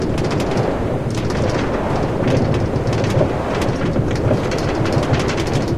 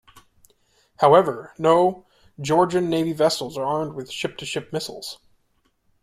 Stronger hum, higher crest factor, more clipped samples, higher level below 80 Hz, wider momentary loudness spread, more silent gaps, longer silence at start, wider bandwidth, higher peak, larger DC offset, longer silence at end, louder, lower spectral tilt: neither; second, 16 dB vs 22 dB; neither; first, -30 dBFS vs -60 dBFS; second, 2 LU vs 16 LU; neither; second, 0 s vs 1 s; second, 14 kHz vs 15.5 kHz; about the same, -2 dBFS vs -2 dBFS; first, 2% vs under 0.1%; second, 0 s vs 0.9 s; about the same, -19 LUFS vs -21 LUFS; first, -6.5 dB/octave vs -5 dB/octave